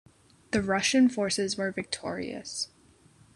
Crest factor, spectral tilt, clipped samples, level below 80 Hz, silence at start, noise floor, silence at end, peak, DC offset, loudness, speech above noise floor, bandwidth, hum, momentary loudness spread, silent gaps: 18 dB; -3.5 dB/octave; under 0.1%; -60 dBFS; 0.5 s; -59 dBFS; 0.7 s; -12 dBFS; under 0.1%; -28 LUFS; 31 dB; 12 kHz; none; 12 LU; none